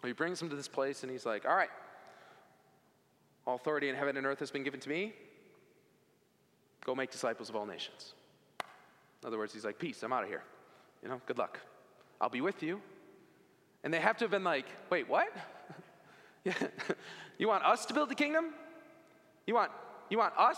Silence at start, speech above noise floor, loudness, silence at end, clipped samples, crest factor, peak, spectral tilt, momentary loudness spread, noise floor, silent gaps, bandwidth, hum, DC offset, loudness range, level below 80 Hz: 0 s; 36 dB; -36 LUFS; 0 s; under 0.1%; 24 dB; -14 dBFS; -4 dB/octave; 19 LU; -71 dBFS; none; 16 kHz; none; under 0.1%; 8 LU; under -90 dBFS